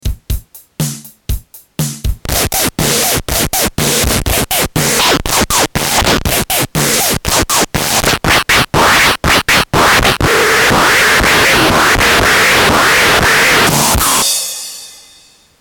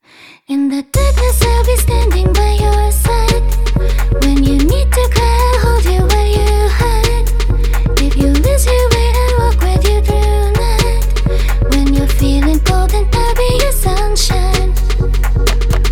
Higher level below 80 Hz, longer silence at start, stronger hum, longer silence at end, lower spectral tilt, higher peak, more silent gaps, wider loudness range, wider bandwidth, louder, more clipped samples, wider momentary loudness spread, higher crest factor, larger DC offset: second, -26 dBFS vs -12 dBFS; second, 0.05 s vs 0.5 s; neither; first, 0.65 s vs 0 s; second, -2.5 dB/octave vs -5.5 dB/octave; about the same, -2 dBFS vs 0 dBFS; neither; first, 6 LU vs 1 LU; first, over 20 kHz vs 17.5 kHz; first, -10 LUFS vs -13 LUFS; neither; first, 13 LU vs 4 LU; about the same, 10 dB vs 10 dB; neither